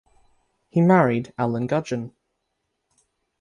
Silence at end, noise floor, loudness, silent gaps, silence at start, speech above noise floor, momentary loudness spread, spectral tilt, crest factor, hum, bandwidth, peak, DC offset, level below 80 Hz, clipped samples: 1.35 s; -77 dBFS; -22 LUFS; none; 0.75 s; 56 dB; 14 LU; -8 dB/octave; 20 dB; none; 9.4 kHz; -6 dBFS; under 0.1%; -62 dBFS; under 0.1%